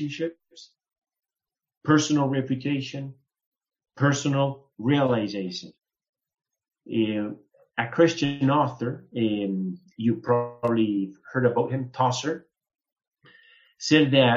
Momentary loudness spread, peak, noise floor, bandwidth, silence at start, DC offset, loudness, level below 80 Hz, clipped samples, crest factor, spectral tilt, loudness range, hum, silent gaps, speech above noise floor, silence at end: 13 LU; -4 dBFS; under -90 dBFS; 7.8 kHz; 0 s; under 0.1%; -25 LUFS; -68 dBFS; under 0.1%; 22 dB; -5.5 dB/octave; 3 LU; none; 0.98-1.02 s, 1.77-1.81 s, 3.46-3.52 s, 6.09-6.13 s; over 66 dB; 0 s